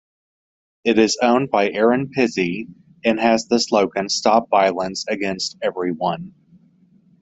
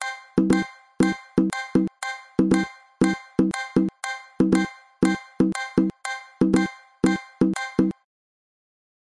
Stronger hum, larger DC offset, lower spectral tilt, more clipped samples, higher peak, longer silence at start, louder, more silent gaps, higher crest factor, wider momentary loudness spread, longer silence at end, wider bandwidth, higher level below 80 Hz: neither; neither; second, -4 dB/octave vs -6 dB/octave; neither; first, -2 dBFS vs -6 dBFS; first, 0.85 s vs 0 s; first, -19 LUFS vs -24 LUFS; neither; about the same, 18 dB vs 18 dB; about the same, 8 LU vs 10 LU; second, 0.9 s vs 1.1 s; second, 8.2 kHz vs 11.5 kHz; second, -60 dBFS vs -52 dBFS